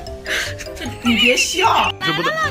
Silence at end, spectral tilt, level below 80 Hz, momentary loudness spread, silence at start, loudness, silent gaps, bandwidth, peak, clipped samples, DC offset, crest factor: 0 s; -2.5 dB/octave; -40 dBFS; 12 LU; 0 s; -16 LUFS; none; 16 kHz; -2 dBFS; under 0.1%; under 0.1%; 16 dB